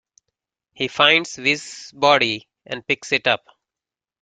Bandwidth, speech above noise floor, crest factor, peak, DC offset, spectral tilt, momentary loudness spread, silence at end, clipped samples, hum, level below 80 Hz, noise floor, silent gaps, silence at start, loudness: 9.4 kHz; 70 dB; 22 dB; 0 dBFS; under 0.1%; -2.5 dB/octave; 15 LU; 0.85 s; under 0.1%; none; -64 dBFS; -90 dBFS; none; 0.8 s; -19 LUFS